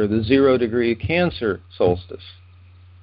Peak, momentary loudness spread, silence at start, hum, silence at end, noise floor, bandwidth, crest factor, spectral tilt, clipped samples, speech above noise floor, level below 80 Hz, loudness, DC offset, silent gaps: -4 dBFS; 11 LU; 0 s; none; 0.7 s; -46 dBFS; 5.4 kHz; 18 dB; -11.5 dB/octave; under 0.1%; 27 dB; -40 dBFS; -20 LUFS; under 0.1%; none